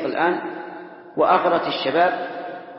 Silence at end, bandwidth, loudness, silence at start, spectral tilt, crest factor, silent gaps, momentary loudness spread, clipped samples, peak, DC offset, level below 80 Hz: 0 s; 5.8 kHz; -20 LUFS; 0 s; -9.5 dB/octave; 18 dB; none; 16 LU; under 0.1%; -4 dBFS; under 0.1%; -66 dBFS